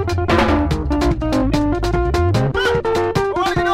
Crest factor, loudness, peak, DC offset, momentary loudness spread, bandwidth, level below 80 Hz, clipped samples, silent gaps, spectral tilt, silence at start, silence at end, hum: 14 dB; -17 LUFS; -2 dBFS; under 0.1%; 3 LU; 15.5 kHz; -26 dBFS; under 0.1%; none; -6.5 dB/octave; 0 s; 0 s; none